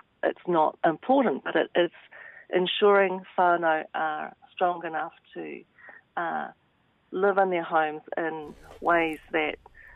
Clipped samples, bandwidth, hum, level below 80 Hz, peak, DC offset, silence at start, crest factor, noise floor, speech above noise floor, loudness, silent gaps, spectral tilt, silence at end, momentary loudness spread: under 0.1%; 11 kHz; none; -64 dBFS; -10 dBFS; under 0.1%; 0.25 s; 16 dB; -67 dBFS; 41 dB; -26 LUFS; none; -7 dB/octave; 0.15 s; 17 LU